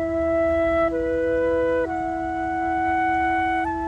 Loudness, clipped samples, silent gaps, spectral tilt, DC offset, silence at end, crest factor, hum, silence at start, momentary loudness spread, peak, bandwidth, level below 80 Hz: -22 LUFS; under 0.1%; none; -7 dB/octave; under 0.1%; 0 s; 10 dB; none; 0 s; 5 LU; -12 dBFS; 9.2 kHz; -42 dBFS